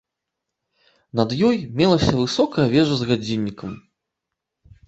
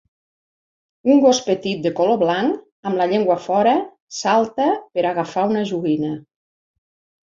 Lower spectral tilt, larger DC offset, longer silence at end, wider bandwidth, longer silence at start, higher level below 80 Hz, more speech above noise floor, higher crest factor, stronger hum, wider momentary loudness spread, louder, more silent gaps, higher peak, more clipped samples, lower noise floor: first, -6.5 dB/octave vs -5 dB/octave; neither; about the same, 1.1 s vs 1 s; about the same, 8.2 kHz vs 7.8 kHz; about the same, 1.15 s vs 1.05 s; first, -46 dBFS vs -64 dBFS; second, 63 dB vs over 72 dB; about the same, 20 dB vs 18 dB; neither; first, 12 LU vs 9 LU; about the same, -20 LUFS vs -19 LUFS; second, none vs 2.72-2.83 s, 4.00-4.07 s; about the same, -2 dBFS vs -2 dBFS; neither; second, -82 dBFS vs under -90 dBFS